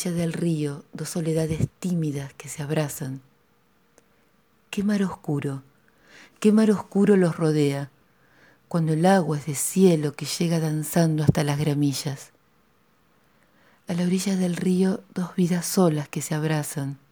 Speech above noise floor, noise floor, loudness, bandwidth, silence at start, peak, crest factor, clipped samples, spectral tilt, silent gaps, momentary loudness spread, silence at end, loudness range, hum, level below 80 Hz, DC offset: 41 dB; -64 dBFS; -24 LUFS; over 20 kHz; 0 s; -6 dBFS; 20 dB; under 0.1%; -6 dB/octave; none; 13 LU; 0.15 s; 8 LU; none; -56 dBFS; under 0.1%